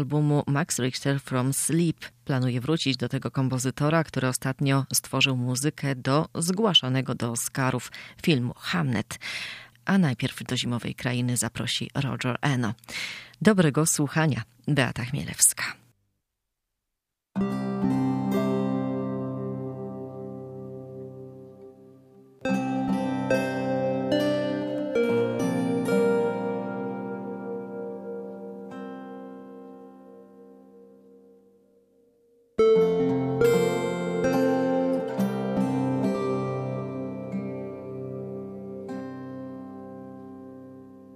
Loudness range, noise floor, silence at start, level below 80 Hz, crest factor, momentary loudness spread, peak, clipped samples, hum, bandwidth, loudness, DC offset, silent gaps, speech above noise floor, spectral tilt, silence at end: 12 LU; -84 dBFS; 0 s; -60 dBFS; 24 dB; 17 LU; -4 dBFS; under 0.1%; 50 Hz at -55 dBFS; 15.5 kHz; -26 LUFS; under 0.1%; none; 59 dB; -4.5 dB/octave; 0 s